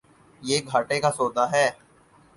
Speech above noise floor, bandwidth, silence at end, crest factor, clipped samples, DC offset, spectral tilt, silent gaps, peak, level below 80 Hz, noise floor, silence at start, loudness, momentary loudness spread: 33 dB; 11.5 kHz; 0.65 s; 18 dB; under 0.1%; under 0.1%; -3.5 dB/octave; none; -8 dBFS; -64 dBFS; -56 dBFS; 0.4 s; -24 LUFS; 4 LU